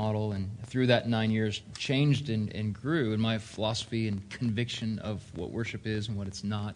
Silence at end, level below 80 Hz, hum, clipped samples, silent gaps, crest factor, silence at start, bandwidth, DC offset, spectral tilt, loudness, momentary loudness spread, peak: 0 s; -60 dBFS; none; under 0.1%; none; 22 dB; 0 s; 10.5 kHz; under 0.1%; -6 dB/octave; -31 LUFS; 9 LU; -8 dBFS